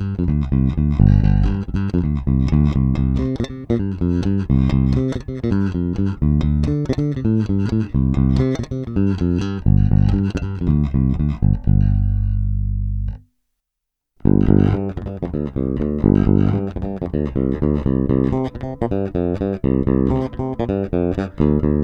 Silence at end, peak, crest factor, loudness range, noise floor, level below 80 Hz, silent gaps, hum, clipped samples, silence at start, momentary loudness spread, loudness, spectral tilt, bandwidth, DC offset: 0 s; 0 dBFS; 18 dB; 3 LU; -80 dBFS; -24 dBFS; none; 50 Hz at -35 dBFS; under 0.1%; 0 s; 8 LU; -19 LUFS; -10 dB/octave; 6.6 kHz; under 0.1%